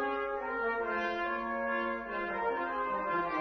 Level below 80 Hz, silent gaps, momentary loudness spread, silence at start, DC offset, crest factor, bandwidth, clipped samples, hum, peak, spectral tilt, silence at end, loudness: -62 dBFS; none; 2 LU; 0 s; under 0.1%; 12 dB; 6.4 kHz; under 0.1%; none; -22 dBFS; -2 dB/octave; 0 s; -34 LUFS